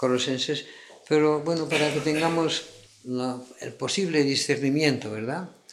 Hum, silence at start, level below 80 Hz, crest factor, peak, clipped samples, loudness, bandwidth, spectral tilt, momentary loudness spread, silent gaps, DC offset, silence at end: none; 0 s; -70 dBFS; 18 dB; -8 dBFS; under 0.1%; -25 LUFS; 13.5 kHz; -4.5 dB/octave; 12 LU; none; under 0.1%; 0.2 s